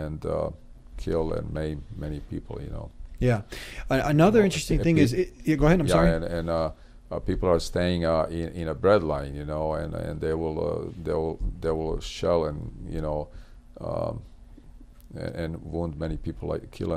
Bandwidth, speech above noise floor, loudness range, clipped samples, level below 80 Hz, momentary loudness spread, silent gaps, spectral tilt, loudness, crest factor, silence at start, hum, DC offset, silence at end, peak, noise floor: 15 kHz; 21 dB; 11 LU; under 0.1%; -38 dBFS; 15 LU; none; -6.5 dB/octave; -27 LUFS; 18 dB; 0 s; none; under 0.1%; 0 s; -8 dBFS; -47 dBFS